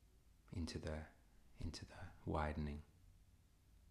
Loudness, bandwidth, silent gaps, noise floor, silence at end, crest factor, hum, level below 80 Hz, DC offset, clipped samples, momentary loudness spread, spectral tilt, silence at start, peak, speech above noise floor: -49 LUFS; 13 kHz; none; -70 dBFS; 0 s; 20 dB; none; -58 dBFS; under 0.1%; under 0.1%; 13 LU; -6 dB/octave; 0 s; -30 dBFS; 24 dB